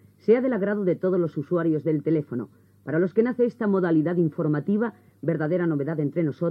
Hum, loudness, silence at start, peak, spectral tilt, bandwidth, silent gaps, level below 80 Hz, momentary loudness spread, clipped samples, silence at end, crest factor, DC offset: none; -24 LUFS; 0.3 s; -8 dBFS; -11 dB/octave; 5.4 kHz; none; -80 dBFS; 7 LU; under 0.1%; 0 s; 16 dB; under 0.1%